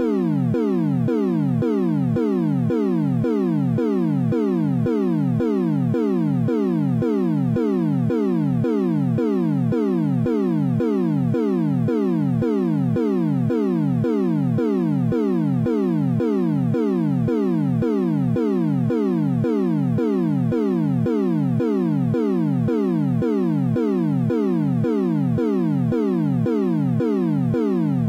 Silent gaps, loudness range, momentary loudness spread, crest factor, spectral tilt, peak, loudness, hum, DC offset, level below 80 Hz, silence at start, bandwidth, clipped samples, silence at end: none; 0 LU; 0 LU; 10 dB; -10 dB/octave; -10 dBFS; -21 LUFS; none; under 0.1%; -54 dBFS; 0 s; 8.6 kHz; under 0.1%; 0 s